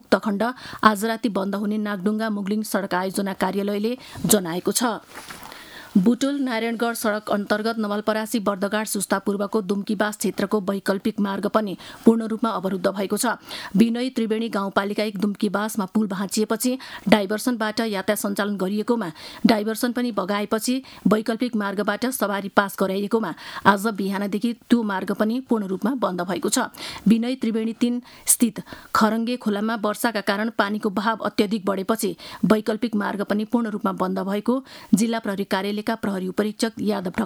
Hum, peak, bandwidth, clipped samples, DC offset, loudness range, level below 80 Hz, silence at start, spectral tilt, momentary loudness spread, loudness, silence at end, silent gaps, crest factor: none; 0 dBFS; over 20 kHz; under 0.1%; under 0.1%; 2 LU; -60 dBFS; 0.1 s; -4.5 dB/octave; 6 LU; -23 LUFS; 0 s; none; 22 dB